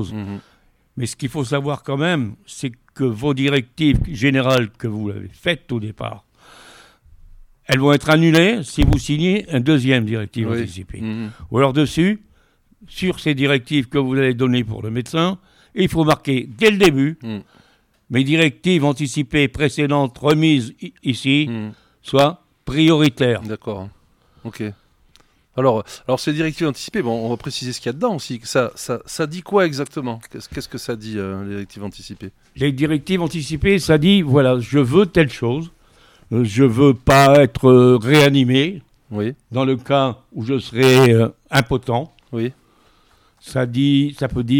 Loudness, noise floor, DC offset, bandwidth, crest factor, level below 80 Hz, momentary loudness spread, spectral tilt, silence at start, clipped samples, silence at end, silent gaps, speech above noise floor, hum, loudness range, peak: -18 LUFS; -57 dBFS; under 0.1%; 17.5 kHz; 18 dB; -38 dBFS; 16 LU; -6 dB/octave; 0 s; under 0.1%; 0 s; none; 39 dB; none; 9 LU; 0 dBFS